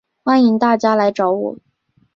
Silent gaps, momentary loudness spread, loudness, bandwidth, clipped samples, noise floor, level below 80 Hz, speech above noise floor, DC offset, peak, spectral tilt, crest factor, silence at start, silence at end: none; 7 LU; -15 LUFS; 7.4 kHz; under 0.1%; -60 dBFS; -62 dBFS; 46 dB; under 0.1%; -2 dBFS; -6.5 dB/octave; 14 dB; 0.25 s; 0.6 s